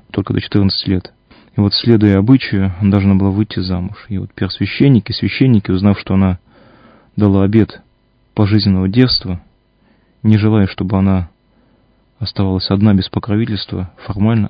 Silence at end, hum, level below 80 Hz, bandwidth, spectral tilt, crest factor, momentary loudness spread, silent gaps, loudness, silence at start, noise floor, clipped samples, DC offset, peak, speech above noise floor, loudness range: 0 s; none; -32 dBFS; 5.2 kHz; -10 dB/octave; 14 dB; 12 LU; none; -14 LUFS; 0.15 s; -55 dBFS; 0.2%; under 0.1%; 0 dBFS; 42 dB; 3 LU